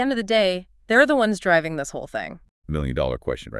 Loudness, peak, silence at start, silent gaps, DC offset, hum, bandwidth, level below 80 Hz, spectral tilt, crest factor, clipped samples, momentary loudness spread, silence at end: -22 LUFS; -4 dBFS; 0 s; 2.51-2.62 s; under 0.1%; none; 12 kHz; -40 dBFS; -5 dB/octave; 18 dB; under 0.1%; 14 LU; 0 s